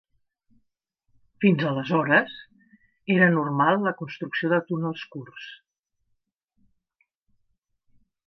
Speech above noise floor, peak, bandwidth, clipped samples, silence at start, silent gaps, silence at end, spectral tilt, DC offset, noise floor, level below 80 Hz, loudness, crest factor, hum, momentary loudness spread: 52 dB; -6 dBFS; 6 kHz; under 0.1%; 1.4 s; none; 2.75 s; -8.5 dB/octave; under 0.1%; -76 dBFS; -72 dBFS; -23 LUFS; 22 dB; none; 20 LU